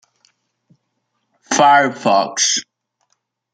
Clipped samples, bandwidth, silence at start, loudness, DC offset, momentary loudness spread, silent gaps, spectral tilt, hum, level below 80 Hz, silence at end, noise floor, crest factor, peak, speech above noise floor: under 0.1%; 10 kHz; 1.5 s; -14 LUFS; under 0.1%; 8 LU; none; -1.5 dB/octave; none; -72 dBFS; 0.9 s; -71 dBFS; 18 dB; -2 dBFS; 57 dB